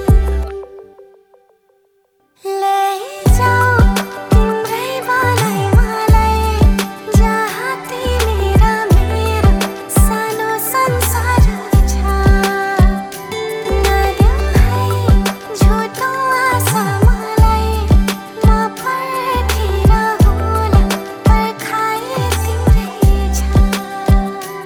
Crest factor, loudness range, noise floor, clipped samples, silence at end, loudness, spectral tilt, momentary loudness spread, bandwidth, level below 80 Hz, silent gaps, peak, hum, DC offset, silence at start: 14 dB; 1 LU; -58 dBFS; under 0.1%; 0 s; -15 LUFS; -5.5 dB/octave; 6 LU; 20 kHz; -16 dBFS; none; 0 dBFS; none; under 0.1%; 0 s